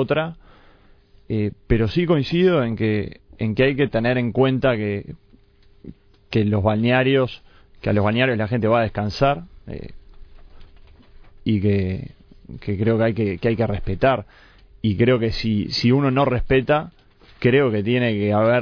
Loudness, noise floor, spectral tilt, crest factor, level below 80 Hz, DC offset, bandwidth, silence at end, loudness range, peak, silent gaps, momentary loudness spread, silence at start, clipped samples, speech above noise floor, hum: -20 LUFS; -52 dBFS; -8 dB/octave; 16 dB; -40 dBFS; under 0.1%; 5.4 kHz; 0 s; 5 LU; -4 dBFS; none; 13 LU; 0 s; under 0.1%; 32 dB; none